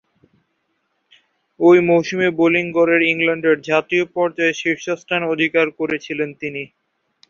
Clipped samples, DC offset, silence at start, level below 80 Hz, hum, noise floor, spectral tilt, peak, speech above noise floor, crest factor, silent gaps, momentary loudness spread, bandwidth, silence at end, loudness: under 0.1%; under 0.1%; 1.6 s; -62 dBFS; none; -69 dBFS; -5.5 dB/octave; -2 dBFS; 52 dB; 16 dB; none; 11 LU; 7.2 kHz; 0.65 s; -17 LUFS